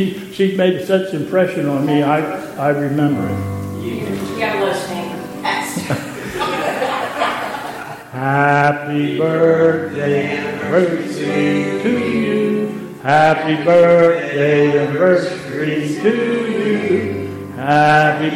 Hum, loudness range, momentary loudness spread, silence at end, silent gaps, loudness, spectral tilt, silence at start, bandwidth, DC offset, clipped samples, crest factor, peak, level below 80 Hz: none; 7 LU; 11 LU; 0 s; none; -16 LUFS; -6 dB/octave; 0 s; 16.5 kHz; under 0.1%; under 0.1%; 16 dB; 0 dBFS; -54 dBFS